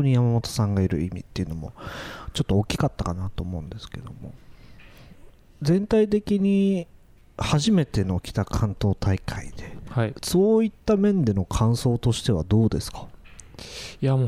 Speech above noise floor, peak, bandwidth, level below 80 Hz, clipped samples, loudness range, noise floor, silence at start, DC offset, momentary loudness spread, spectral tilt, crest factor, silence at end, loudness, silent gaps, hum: 24 dB; -8 dBFS; 15 kHz; -40 dBFS; under 0.1%; 7 LU; -48 dBFS; 0 s; under 0.1%; 18 LU; -6.5 dB/octave; 14 dB; 0 s; -24 LUFS; none; none